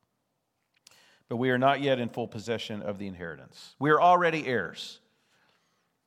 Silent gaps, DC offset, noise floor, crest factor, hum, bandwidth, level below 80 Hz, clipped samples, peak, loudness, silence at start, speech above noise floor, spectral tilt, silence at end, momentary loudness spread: none; under 0.1%; -79 dBFS; 20 dB; none; 13.5 kHz; -76 dBFS; under 0.1%; -10 dBFS; -27 LUFS; 1.3 s; 51 dB; -6 dB/octave; 1.1 s; 19 LU